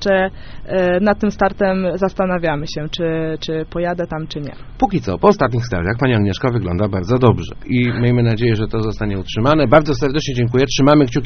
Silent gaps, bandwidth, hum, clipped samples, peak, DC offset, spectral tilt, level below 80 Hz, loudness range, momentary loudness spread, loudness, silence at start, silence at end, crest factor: none; 6.6 kHz; none; under 0.1%; 0 dBFS; under 0.1%; -6 dB/octave; -34 dBFS; 4 LU; 10 LU; -17 LUFS; 0 s; 0 s; 16 dB